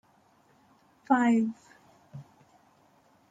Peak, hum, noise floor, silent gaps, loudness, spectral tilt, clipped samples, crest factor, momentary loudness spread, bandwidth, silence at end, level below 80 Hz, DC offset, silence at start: -10 dBFS; none; -64 dBFS; none; -26 LUFS; -6.5 dB/octave; under 0.1%; 22 dB; 26 LU; 9 kHz; 1.1 s; -78 dBFS; under 0.1%; 1.1 s